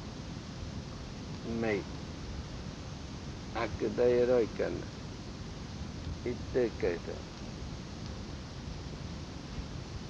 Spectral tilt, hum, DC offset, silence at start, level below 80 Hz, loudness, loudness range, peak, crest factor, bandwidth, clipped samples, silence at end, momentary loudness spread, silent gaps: -6 dB/octave; none; under 0.1%; 0 s; -48 dBFS; -37 LUFS; 6 LU; -16 dBFS; 20 dB; 9.6 kHz; under 0.1%; 0 s; 14 LU; none